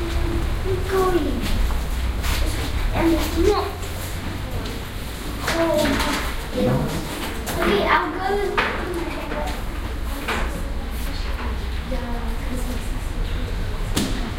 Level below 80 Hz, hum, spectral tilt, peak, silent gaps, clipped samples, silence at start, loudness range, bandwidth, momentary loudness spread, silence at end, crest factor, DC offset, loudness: -26 dBFS; none; -5 dB/octave; -4 dBFS; none; under 0.1%; 0 s; 6 LU; 16.5 kHz; 10 LU; 0 s; 18 dB; under 0.1%; -24 LUFS